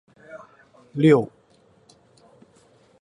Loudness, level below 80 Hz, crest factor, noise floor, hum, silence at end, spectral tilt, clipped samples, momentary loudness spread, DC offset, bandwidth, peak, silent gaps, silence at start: -19 LUFS; -66 dBFS; 22 dB; -58 dBFS; none; 1.75 s; -8 dB/octave; under 0.1%; 27 LU; under 0.1%; 10 kHz; -4 dBFS; none; 0.35 s